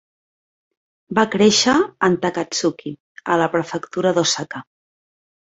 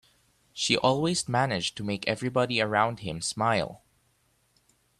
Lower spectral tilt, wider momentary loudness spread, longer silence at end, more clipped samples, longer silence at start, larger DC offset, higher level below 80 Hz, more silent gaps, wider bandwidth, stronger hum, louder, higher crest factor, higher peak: about the same, -3.5 dB/octave vs -4 dB/octave; first, 17 LU vs 8 LU; second, 0.8 s vs 1.25 s; neither; first, 1.1 s vs 0.55 s; neither; about the same, -58 dBFS vs -62 dBFS; first, 3.00-3.15 s vs none; second, 8.2 kHz vs 13.5 kHz; neither; first, -18 LUFS vs -27 LUFS; about the same, 20 dB vs 22 dB; first, -2 dBFS vs -8 dBFS